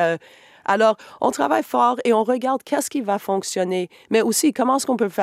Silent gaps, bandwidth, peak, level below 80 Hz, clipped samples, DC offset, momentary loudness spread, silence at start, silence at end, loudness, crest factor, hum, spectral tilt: none; 16 kHz; -4 dBFS; -72 dBFS; under 0.1%; under 0.1%; 6 LU; 0 s; 0 s; -21 LUFS; 16 dB; none; -3.5 dB/octave